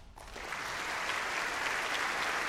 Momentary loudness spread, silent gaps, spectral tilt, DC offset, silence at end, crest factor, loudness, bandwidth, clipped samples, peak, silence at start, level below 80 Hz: 9 LU; none; -1 dB/octave; under 0.1%; 0 s; 18 dB; -34 LUFS; 16 kHz; under 0.1%; -18 dBFS; 0 s; -58 dBFS